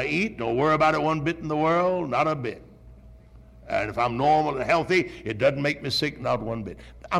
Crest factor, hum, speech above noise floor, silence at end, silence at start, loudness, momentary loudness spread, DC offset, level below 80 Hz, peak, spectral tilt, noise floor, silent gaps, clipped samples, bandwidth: 14 dB; none; 24 dB; 0 s; 0 s; -24 LUFS; 10 LU; under 0.1%; -50 dBFS; -10 dBFS; -6 dB/octave; -49 dBFS; none; under 0.1%; 14.5 kHz